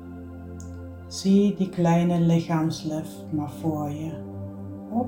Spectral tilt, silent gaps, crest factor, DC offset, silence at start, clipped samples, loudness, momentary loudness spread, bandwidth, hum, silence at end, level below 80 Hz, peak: -7 dB/octave; none; 16 dB; under 0.1%; 0 s; under 0.1%; -25 LUFS; 18 LU; 16.5 kHz; none; 0 s; -56 dBFS; -10 dBFS